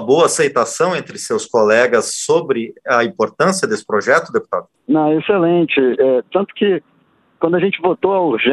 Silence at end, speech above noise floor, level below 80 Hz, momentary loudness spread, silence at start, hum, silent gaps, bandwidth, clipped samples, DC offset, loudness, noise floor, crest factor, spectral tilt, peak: 0 s; 29 dB; -62 dBFS; 8 LU; 0 s; none; none; 12.5 kHz; under 0.1%; under 0.1%; -16 LUFS; -44 dBFS; 16 dB; -4.5 dB/octave; 0 dBFS